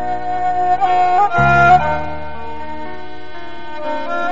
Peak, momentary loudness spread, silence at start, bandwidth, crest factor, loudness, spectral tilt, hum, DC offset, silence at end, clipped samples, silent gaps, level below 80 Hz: -2 dBFS; 21 LU; 0 s; 7.6 kHz; 16 dB; -14 LUFS; -4.5 dB/octave; none; 7%; 0 s; under 0.1%; none; -38 dBFS